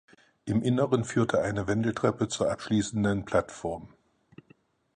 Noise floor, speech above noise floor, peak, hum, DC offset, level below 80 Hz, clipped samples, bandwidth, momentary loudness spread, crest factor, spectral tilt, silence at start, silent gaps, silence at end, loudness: -62 dBFS; 35 dB; -10 dBFS; none; under 0.1%; -54 dBFS; under 0.1%; 10 kHz; 10 LU; 18 dB; -6 dB/octave; 0.45 s; none; 1.1 s; -28 LUFS